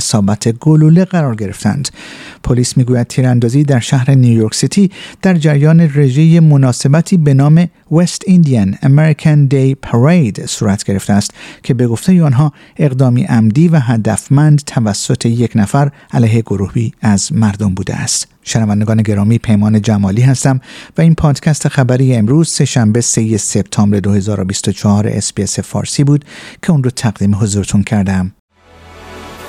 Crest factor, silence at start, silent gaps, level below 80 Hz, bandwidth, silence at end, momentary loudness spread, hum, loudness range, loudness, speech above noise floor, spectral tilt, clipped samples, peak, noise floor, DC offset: 10 dB; 0 s; 28.39-28.48 s; -40 dBFS; 13 kHz; 0 s; 7 LU; none; 4 LU; -11 LUFS; 28 dB; -6 dB/octave; under 0.1%; 0 dBFS; -38 dBFS; under 0.1%